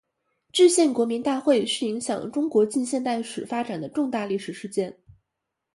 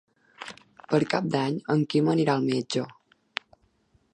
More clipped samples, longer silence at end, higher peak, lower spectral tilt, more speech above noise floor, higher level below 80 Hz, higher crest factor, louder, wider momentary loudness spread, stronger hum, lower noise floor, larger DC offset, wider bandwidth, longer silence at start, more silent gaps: neither; second, 0.85 s vs 1.2 s; about the same, -6 dBFS vs -8 dBFS; second, -4 dB/octave vs -6.5 dB/octave; first, 59 dB vs 41 dB; about the same, -70 dBFS vs -70 dBFS; about the same, 18 dB vs 20 dB; about the same, -24 LUFS vs -26 LUFS; second, 11 LU vs 19 LU; neither; first, -82 dBFS vs -66 dBFS; neither; first, 11.5 kHz vs 10 kHz; first, 0.55 s vs 0.4 s; neither